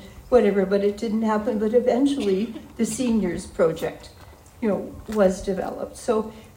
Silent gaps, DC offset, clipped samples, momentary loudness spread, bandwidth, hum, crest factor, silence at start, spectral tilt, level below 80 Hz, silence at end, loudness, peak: none; under 0.1%; under 0.1%; 10 LU; 16 kHz; none; 18 dB; 0 s; -6 dB/octave; -48 dBFS; 0.1 s; -23 LUFS; -4 dBFS